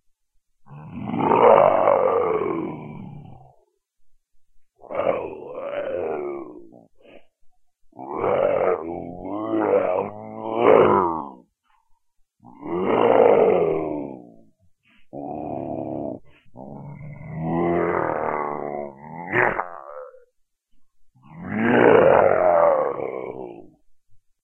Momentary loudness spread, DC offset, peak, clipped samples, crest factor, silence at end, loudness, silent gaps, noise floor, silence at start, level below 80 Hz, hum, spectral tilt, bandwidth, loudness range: 23 LU; under 0.1%; -2 dBFS; under 0.1%; 22 dB; 0.25 s; -21 LUFS; none; -65 dBFS; 0.7 s; -58 dBFS; none; -9 dB/octave; 3.4 kHz; 11 LU